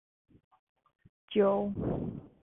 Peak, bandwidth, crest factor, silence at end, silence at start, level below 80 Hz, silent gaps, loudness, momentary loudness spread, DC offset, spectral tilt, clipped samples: -16 dBFS; 3.8 kHz; 18 dB; 0.15 s; 1.3 s; -54 dBFS; none; -31 LUFS; 10 LU; under 0.1%; -10.5 dB/octave; under 0.1%